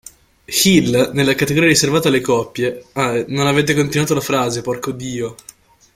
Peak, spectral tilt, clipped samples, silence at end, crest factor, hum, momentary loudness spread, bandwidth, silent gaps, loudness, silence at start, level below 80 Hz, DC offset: 0 dBFS; -4 dB/octave; under 0.1%; 0.6 s; 16 dB; none; 11 LU; 16.5 kHz; none; -16 LUFS; 0.5 s; -48 dBFS; under 0.1%